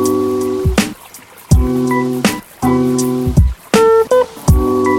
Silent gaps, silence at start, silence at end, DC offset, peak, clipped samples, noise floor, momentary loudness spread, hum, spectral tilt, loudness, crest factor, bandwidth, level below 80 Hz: none; 0 s; 0 s; under 0.1%; 0 dBFS; under 0.1%; -37 dBFS; 6 LU; none; -6 dB/octave; -14 LUFS; 14 dB; 17 kHz; -22 dBFS